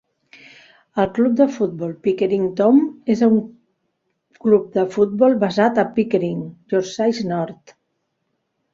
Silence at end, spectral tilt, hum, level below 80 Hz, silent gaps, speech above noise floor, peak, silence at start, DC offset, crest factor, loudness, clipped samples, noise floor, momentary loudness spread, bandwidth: 1.2 s; -7 dB/octave; none; -60 dBFS; none; 55 dB; -2 dBFS; 0.95 s; under 0.1%; 16 dB; -19 LUFS; under 0.1%; -73 dBFS; 9 LU; 7.6 kHz